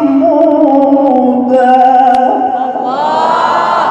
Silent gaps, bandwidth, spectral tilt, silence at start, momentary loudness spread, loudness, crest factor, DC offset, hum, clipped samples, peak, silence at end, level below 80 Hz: none; 8.6 kHz; -6 dB/octave; 0 s; 7 LU; -9 LUFS; 8 dB; under 0.1%; none; 0.7%; 0 dBFS; 0 s; -54 dBFS